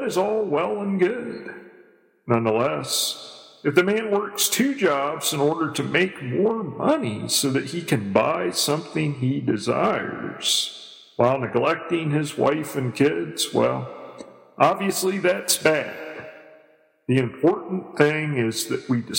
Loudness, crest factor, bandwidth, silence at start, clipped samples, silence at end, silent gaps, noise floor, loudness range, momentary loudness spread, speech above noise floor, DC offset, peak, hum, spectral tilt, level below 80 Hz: -22 LUFS; 22 dB; 17 kHz; 0 s; under 0.1%; 0 s; none; -57 dBFS; 2 LU; 12 LU; 35 dB; under 0.1%; -2 dBFS; none; -4 dB/octave; -66 dBFS